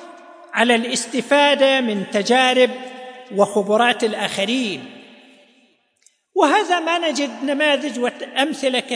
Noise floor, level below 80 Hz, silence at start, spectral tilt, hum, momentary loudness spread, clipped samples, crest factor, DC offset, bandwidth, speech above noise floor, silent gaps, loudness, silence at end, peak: -60 dBFS; -78 dBFS; 0 s; -3 dB/octave; none; 11 LU; under 0.1%; 18 dB; under 0.1%; 10.5 kHz; 41 dB; none; -18 LUFS; 0 s; -2 dBFS